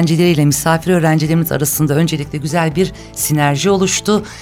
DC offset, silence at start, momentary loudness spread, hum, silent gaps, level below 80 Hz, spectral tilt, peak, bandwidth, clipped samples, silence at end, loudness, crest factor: under 0.1%; 0 s; 6 LU; none; none; -40 dBFS; -5 dB/octave; -2 dBFS; 17 kHz; under 0.1%; 0 s; -14 LUFS; 12 dB